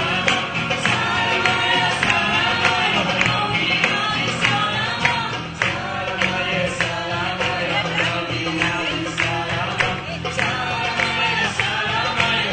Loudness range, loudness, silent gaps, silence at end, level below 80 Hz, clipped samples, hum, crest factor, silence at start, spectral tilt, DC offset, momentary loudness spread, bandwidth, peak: 4 LU; -19 LUFS; none; 0 s; -48 dBFS; under 0.1%; none; 18 dB; 0 s; -3.5 dB/octave; under 0.1%; 5 LU; 9.2 kHz; -2 dBFS